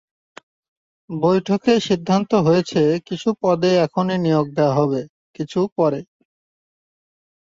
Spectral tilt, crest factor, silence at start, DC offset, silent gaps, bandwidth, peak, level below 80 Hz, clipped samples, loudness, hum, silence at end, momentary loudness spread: -7 dB/octave; 16 dB; 1.1 s; under 0.1%; 5.09-5.34 s, 5.72-5.76 s; 7.8 kHz; -4 dBFS; -58 dBFS; under 0.1%; -19 LUFS; none; 1.55 s; 9 LU